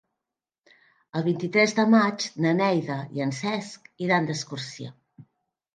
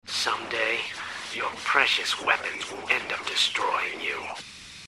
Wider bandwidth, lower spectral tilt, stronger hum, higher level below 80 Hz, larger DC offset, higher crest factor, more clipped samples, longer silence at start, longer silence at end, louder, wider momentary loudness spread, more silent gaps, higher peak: second, 9.4 kHz vs 15 kHz; first, -5.5 dB/octave vs -0.5 dB/octave; neither; second, -72 dBFS vs -66 dBFS; neither; second, 20 dB vs 26 dB; neither; first, 1.15 s vs 0.05 s; first, 0.55 s vs 0 s; about the same, -25 LUFS vs -26 LUFS; first, 15 LU vs 11 LU; neither; second, -6 dBFS vs -2 dBFS